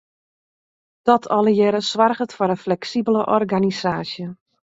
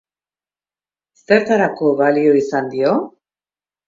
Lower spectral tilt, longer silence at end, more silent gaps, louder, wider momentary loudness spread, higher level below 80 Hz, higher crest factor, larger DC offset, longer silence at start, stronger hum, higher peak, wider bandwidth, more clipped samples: about the same, -6 dB/octave vs -6.5 dB/octave; second, 0.4 s vs 0.8 s; neither; second, -19 LUFS vs -16 LUFS; about the same, 9 LU vs 7 LU; about the same, -62 dBFS vs -64 dBFS; about the same, 18 dB vs 18 dB; neither; second, 1.05 s vs 1.3 s; second, none vs 50 Hz at -45 dBFS; about the same, -2 dBFS vs 0 dBFS; about the same, 7.8 kHz vs 7.6 kHz; neither